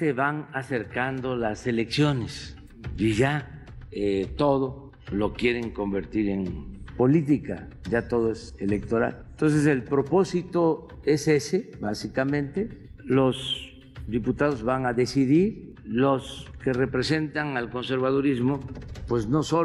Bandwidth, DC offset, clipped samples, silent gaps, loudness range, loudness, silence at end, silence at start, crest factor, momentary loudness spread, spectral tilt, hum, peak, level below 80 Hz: 12 kHz; under 0.1%; under 0.1%; none; 3 LU; -26 LUFS; 0 s; 0 s; 16 dB; 13 LU; -6.5 dB/octave; none; -10 dBFS; -46 dBFS